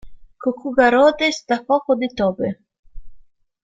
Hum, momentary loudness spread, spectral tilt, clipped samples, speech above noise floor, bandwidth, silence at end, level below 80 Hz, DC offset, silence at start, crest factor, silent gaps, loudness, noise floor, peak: none; 12 LU; -4.5 dB/octave; under 0.1%; 27 dB; 7.8 kHz; 0.4 s; -46 dBFS; under 0.1%; 0.05 s; 18 dB; 2.79-2.83 s; -18 LUFS; -45 dBFS; -2 dBFS